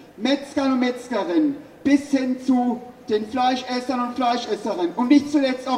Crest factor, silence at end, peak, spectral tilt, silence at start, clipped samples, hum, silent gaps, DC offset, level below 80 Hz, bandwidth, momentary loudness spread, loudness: 16 dB; 0 s; -4 dBFS; -4.5 dB/octave; 0 s; under 0.1%; none; none; under 0.1%; -64 dBFS; 11 kHz; 8 LU; -22 LUFS